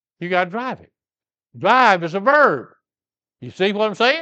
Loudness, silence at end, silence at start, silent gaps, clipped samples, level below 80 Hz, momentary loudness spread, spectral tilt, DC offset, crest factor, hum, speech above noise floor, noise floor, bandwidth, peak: -17 LUFS; 0 s; 0.2 s; none; under 0.1%; -72 dBFS; 14 LU; -5 dB/octave; under 0.1%; 20 dB; none; over 72 dB; under -90 dBFS; 8.4 kHz; 0 dBFS